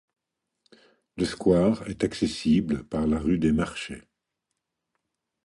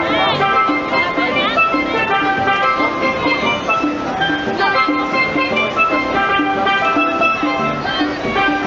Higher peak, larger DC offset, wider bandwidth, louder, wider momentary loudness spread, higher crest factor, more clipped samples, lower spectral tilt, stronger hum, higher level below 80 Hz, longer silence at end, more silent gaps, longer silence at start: second, -8 dBFS vs -2 dBFS; neither; first, 11.5 kHz vs 7.6 kHz; second, -25 LUFS vs -15 LUFS; first, 13 LU vs 4 LU; first, 20 dB vs 14 dB; neither; first, -6.5 dB/octave vs -5 dB/octave; neither; about the same, -46 dBFS vs -44 dBFS; first, 1.45 s vs 0 s; neither; first, 1.15 s vs 0 s